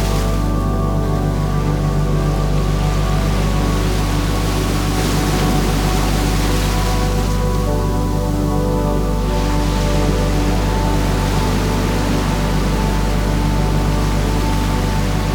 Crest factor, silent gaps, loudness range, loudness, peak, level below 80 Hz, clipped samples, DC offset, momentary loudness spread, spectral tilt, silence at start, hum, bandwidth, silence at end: 12 dB; none; 1 LU; -18 LUFS; -4 dBFS; -20 dBFS; under 0.1%; under 0.1%; 2 LU; -6 dB/octave; 0 s; none; 19.5 kHz; 0 s